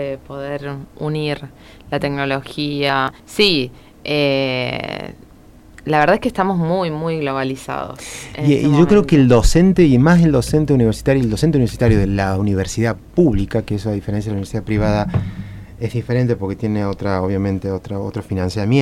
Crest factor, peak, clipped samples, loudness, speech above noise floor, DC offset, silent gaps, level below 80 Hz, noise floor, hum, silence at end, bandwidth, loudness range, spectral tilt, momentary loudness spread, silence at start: 14 dB; -2 dBFS; under 0.1%; -17 LUFS; 27 dB; under 0.1%; none; -32 dBFS; -43 dBFS; none; 0 s; 14.5 kHz; 7 LU; -6.5 dB/octave; 15 LU; 0 s